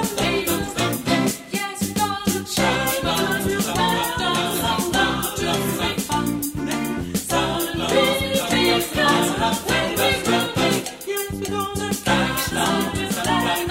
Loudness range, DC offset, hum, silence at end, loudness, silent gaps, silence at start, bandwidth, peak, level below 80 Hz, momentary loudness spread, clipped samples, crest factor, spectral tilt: 3 LU; under 0.1%; none; 0 s; -21 LUFS; none; 0 s; 16.5 kHz; -4 dBFS; -42 dBFS; 6 LU; under 0.1%; 16 dB; -3.5 dB/octave